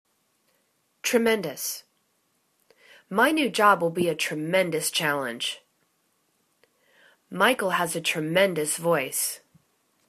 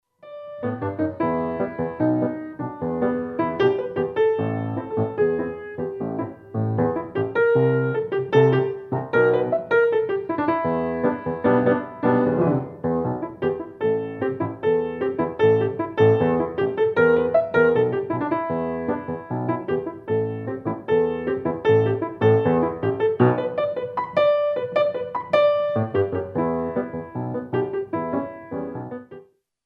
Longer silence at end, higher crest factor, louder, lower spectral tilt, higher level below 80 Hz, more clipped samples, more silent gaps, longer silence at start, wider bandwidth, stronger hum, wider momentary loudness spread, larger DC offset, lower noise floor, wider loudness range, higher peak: first, 0.7 s vs 0.45 s; about the same, 22 dB vs 18 dB; about the same, -24 LUFS vs -23 LUFS; second, -3 dB/octave vs -9.5 dB/octave; second, -72 dBFS vs -56 dBFS; neither; neither; first, 1.05 s vs 0.25 s; first, 14 kHz vs 6.2 kHz; neither; about the same, 10 LU vs 10 LU; neither; first, -71 dBFS vs -48 dBFS; about the same, 4 LU vs 5 LU; about the same, -6 dBFS vs -4 dBFS